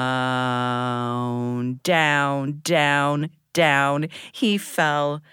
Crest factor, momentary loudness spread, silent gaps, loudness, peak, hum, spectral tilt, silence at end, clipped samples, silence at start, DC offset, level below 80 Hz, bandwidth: 18 dB; 8 LU; none; -22 LUFS; -4 dBFS; none; -5 dB/octave; 0.15 s; under 0.1%; 0 s; under 0.1%; -70 dBFS; 19.5 kHz